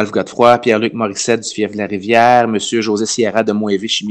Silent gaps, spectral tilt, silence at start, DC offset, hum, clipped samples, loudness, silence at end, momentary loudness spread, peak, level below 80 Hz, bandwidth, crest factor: none; -4 dB/octave; 0 s; under 0.1%; none; under 0.1%; -14 LUFS; 0 s; 8 LU; 0 dBFS; -58 dBFS; 11.5 kHz; 14 dB